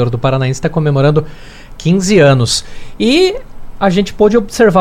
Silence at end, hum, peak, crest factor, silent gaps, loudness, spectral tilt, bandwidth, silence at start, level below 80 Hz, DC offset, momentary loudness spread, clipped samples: 0 s; none; 0 dBFS; 12 dB; none; -12 LUFS; -5.5 dB/octave; 15.5 kHz; 0 s; -32 dBFS; under 0.1%; 8 LU; under 0.1%